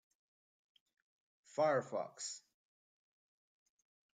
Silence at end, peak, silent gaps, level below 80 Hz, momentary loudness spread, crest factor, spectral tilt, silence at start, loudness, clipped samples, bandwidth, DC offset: 1.75 s; -22 dBFS; none; under -90 dBFS; 12 LU; 22 dB; -3.5 dB/octave; 1.55 s; -39 LUFS; under 0.1%; 9.6 kHz; under 0.1%